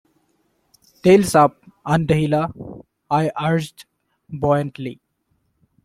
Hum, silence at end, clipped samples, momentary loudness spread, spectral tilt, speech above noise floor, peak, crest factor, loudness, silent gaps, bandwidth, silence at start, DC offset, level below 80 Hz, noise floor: none; 0.9 s; under 0.1%; 20 LU; -6.5 dB/octave; 51 dB; -2 dBFS; 18 dB; -19 LUFS; none; 15.5 kHz; 1.05 s; under 0.1%; -50 dBFS; -68 dBFS